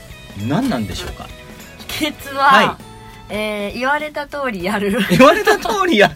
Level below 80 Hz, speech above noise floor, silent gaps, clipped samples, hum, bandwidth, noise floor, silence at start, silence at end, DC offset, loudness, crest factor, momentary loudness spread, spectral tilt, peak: -42 dBFS; 20 dB; none; 0.1%; none; 16.5 kHz; -36 dBFS; 0 s; 0 s; under 0.1%; -16 LUFS; 16 dB; 23 LU; -4.5 dB/octave; 0 dBFS